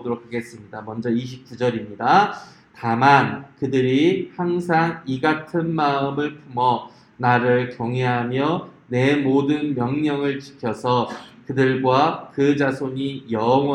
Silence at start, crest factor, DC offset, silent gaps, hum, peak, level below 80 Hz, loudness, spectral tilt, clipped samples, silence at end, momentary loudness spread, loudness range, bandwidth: 0 s; 20 dB; under 0.1%; none; none; 0 dBFS; -62 dBFS; -21 LUFS; -7 dB/octave; under 0.1%; 0 s; 11 LU; 2 LU; 10.5 kHz